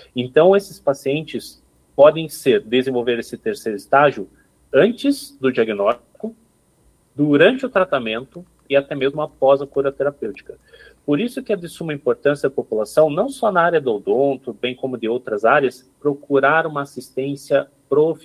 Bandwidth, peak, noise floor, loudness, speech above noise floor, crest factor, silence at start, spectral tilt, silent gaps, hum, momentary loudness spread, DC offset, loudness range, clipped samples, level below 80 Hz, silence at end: 15.5 kHz; 0 dBFS; -58 dBFS; -19 LUFS; 39 dB; 18 dB; 0.15 s; -5.5 dB/octave; none; none; 13 LU; under 0.1%; 3 LU; under 0.1%; -60 dBFS; 0.05 s